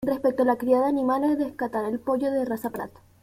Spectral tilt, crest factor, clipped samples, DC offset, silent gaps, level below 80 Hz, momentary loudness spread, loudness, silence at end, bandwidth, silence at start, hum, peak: -7 dB/octave; 16 dB; under 0.1%; under 0.1%; none; -60 dBFS; 9 LU; -25 LUFS; 0.35 s; 16 kHz; 0 s; none; -8 dBFS